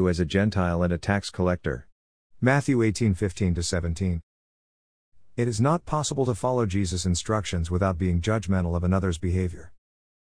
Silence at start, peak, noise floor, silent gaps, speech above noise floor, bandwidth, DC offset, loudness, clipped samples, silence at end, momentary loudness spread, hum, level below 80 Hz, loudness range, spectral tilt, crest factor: 0 s; -8 dBFS; under -90 dBFS; 1.92-2.30 s, 4.23-5.12 s; over 66 dB; 10.5 kHz; 0.3%; -25 LUFS; under 0.1%; 0.7 s; 6 LU; none; -42 dBFS; 2 LU; -6 dB/octave; 18 dB